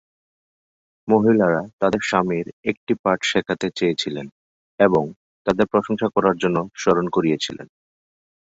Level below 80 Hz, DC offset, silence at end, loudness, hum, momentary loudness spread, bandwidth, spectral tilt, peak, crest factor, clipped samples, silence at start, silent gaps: -56 dBFS; under 0.1%; 0.8 s; -21 LUFS; none; 10 LU; 8 kHz; -5.5 dB/octave; -2 dBFS; 20 dB; under 0.1%; 1.05 s; 1.73-1.78 s, 2.53-2.63 s, 2.77-2.87 s, 2.99-3.04 s, 4.32-4.78 s, 5.16-5.45 s